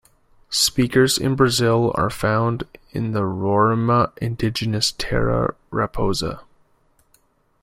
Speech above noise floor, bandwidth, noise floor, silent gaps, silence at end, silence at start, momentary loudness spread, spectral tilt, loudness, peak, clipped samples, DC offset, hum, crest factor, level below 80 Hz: 41 dB; 16 kHz; -61 dBFS; none; 1.2 s; 0.5 s; 8 LU; -4.5 dB/octave; -20 LUFS; -2 dBFS; under 0.1%; under 0.1%; none; 20 dB; -42 dBFS